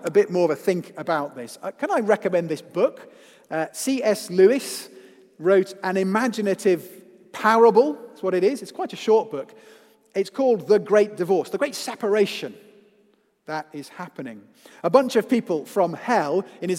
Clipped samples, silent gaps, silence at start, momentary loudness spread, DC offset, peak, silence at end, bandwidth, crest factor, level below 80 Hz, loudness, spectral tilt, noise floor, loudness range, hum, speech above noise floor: under 0.1%; none; 0 s; 16 LU; under 0.1%; -2 dBFS; 0 s; 16 kHz; 20 dB; -80 dBFS; -22 LUFS; -5 dB/octave; -62 dBFS; 5 LU; none; 40 dB